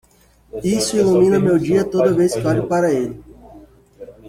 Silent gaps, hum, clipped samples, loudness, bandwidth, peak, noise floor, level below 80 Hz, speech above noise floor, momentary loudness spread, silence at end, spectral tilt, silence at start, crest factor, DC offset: none; none; under 0.1%; -17 LUFS; 15.5 kHz; -4 dBFS; -44 dBFS; -48 dBFS; 28 dB; 12 LU; 0 s; -6 dB/octave; 0.55 s; 14 dB; under 0.1%